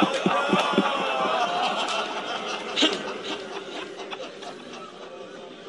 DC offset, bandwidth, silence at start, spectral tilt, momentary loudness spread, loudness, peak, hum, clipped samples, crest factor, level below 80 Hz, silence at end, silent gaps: under 0.1%; 11.5 kHz; 0 s; -3.5 dB/octave; 17 LU; -26 LUFS; -8 dBFS; none; under 0.1%; 20 dB; -72 dBFS; 0 s; none